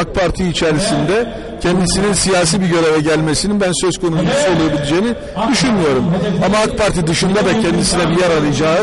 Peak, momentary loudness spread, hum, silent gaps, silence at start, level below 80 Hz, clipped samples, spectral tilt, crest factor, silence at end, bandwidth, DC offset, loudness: -4 dBFS; 3 LU; none; none; 0 s; -32 dBFS; under 0.1%; -4.5 dB/octave; 10 dB; 0 s; 11.5 kHz; under 0.1%; -14 LUFS